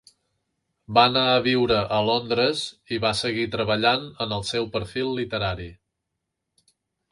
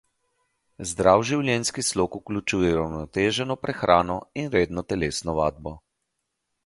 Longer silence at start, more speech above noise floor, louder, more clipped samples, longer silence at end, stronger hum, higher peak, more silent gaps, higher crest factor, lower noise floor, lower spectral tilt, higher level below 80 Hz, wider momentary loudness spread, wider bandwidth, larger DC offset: about the same, 0.9 s vs 0.8 s; about the same, 58 dB vs 55 dB; about the same, -23 LUFS vs -24 LUFS; neither; first, 1.4 s vs 0.85 s; neither; about the same, -2 dBFS vs -2 dBFS; neither; about the same, 22 dB vs 24 dB; about the same, -81 dBFS vs -79 dBFS; about the same, -5 dB/octave vs -4.5 dB/octave; about the same, -50 dBFS vs -46 dBFS; about the same, 10 LU vs 9 LU; about the same, 11.5 kHz vs 11.5 kHz; neither